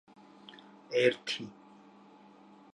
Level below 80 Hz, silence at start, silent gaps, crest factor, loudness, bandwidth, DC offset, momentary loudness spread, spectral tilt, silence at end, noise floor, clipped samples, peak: -84 dBFS; 0.5 s; none; 26 dB; -31 LUFS; 11 kHz; under 0.1%; 25 LU; -4 dB/octave; 1.2 s; -57 dBFS; under 0.1%; -12 dBFS